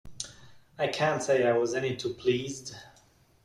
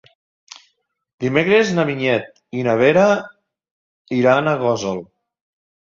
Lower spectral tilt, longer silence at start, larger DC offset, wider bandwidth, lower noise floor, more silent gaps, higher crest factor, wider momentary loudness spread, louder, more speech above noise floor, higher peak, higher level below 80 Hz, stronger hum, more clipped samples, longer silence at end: second, -4.5 dB/octave vs -6 dB/octave; second, 0.05 s vs 1.2 s; neither; first, 13 kHz vs 7.6 kHz; second, -62 dBFS vs -67 dBFS; second, none vs 3.71-4.05 s; about the same, 18 dB vs 18 dB; first, 15 LU vs 11 LU; second, -28 LUFS vs -17 LUFS; second, 34 dB vs 51 dB; second, -12 dBFS vs -2 dBFS; about the same, -62 dBFS vs -60 dBFS; neither; neither; second, 0.55 s vs 0.9 s